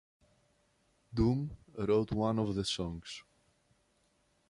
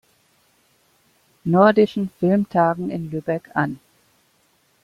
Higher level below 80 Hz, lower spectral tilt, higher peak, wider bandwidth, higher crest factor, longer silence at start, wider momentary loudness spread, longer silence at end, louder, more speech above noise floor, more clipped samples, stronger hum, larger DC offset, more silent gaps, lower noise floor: first, -52 dBFS vs -62 dBFS; second, -6.5 dB/octave vs -8.5 dB/octave; second, -18 dBFS vs -2 dBFS; about the same, 11.5 kHz vs 11.5 kHz; about the same, 18 dB vs 20 dB; second, 1.1 s vs 1.45 s; about the same, 13 LU vs 12 LU; first, 1.3 s vs 1.05 s; second, -34 LUFS vs -20 LUFS; about the same, 41 dB vs 43 dB; neither; neither; neither; neither; first, -74 dBFS vs -62 dBFS